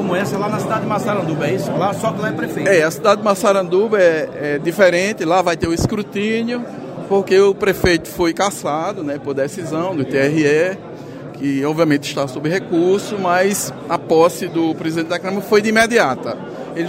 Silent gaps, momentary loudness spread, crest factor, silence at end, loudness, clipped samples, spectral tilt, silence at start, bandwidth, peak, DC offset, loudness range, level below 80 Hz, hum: none; 9 LU; 16 dB; 0 s; -17 LUFS; under 0.1%; -5 dB/octave; 0 s; 16 kHz; 0 dBFS; under 0.1%; 3 LU; -44 dBFS; none